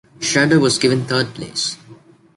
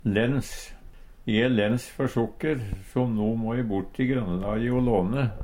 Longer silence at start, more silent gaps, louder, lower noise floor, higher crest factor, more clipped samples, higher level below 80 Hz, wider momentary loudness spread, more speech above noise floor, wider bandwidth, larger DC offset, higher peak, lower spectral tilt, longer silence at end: first, 0.2 s vs 0.05 s; neither; first, -17 LUFS vs -26 LUFS; about the same, -45 dBFS vs -45 dBFS; about the same, 16 dB vs 18 dB; neither; second, -54 dBFS vs -42 dBFS; about the same, 10 LU vs 8 LU; first, 28 dB vs 20 dB; second, 11.5 kHz vs 16.5 kHz; neither; first, -2 dBFS vs -8 dBFS; second, -4 dB/octave vs -7 dB/octave; first, 0.45 s vs 0 s